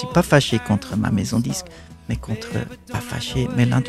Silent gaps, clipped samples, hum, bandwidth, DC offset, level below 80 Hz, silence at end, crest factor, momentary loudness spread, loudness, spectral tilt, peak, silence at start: none; under 0.1%; none; 14 kHz; under 0.1%; -40 dBFS; 0 s; 20 dB; 13 LU; -22 LUFS; -5.5 dB/octave; 0 dBFS; 0 s